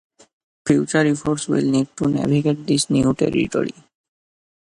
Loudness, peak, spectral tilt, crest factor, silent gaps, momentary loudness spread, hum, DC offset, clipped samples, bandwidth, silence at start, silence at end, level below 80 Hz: -20 LUFS; -2 dBFS; -5.5 dB/octave; 18 dB; none; 5 LU; none; under 0.1%; under 0.1%; 11.5 kHz; 0.65 s; 0.95 s; -50 dBFS